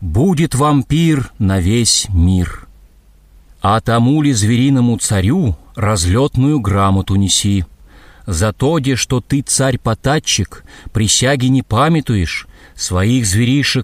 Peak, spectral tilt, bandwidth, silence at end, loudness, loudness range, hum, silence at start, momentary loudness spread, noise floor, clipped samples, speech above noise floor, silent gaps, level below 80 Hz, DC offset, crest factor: 0 dBFS; -4.5 dB/octave; 15.5 kHz; 0 s; -14 LUFS; 2 LU; none; 0 s; 7 LU; -46 dBFS; under 0.1%; 32 dB; none; -32 dBFS; under 0.1%; 14 dB